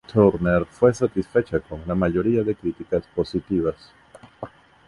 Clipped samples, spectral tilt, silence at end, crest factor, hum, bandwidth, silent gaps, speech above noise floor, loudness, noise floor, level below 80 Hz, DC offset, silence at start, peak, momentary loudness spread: under 0.1%; -8 dB/octave; 0.4 s; 20 dB; none; 11 kHz; none; 18 dB; -22 LUFS; -40 dBFS; -44 dBFS; under 0.1%; 0.1 s; -4 dBFS; 20 LU